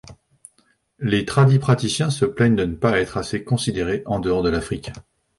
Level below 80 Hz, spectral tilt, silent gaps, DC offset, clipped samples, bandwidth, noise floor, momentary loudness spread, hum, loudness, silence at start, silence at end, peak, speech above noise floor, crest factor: -42 dBFS; -6 dB/octave; none; under 0.1%; under 0.1%; 11.5 kHz; -63 dBFS; 10 LU; none; -20 LUFS; 0.1 s; 0.35 s; -2 dBFS; 43 dB; 18 dB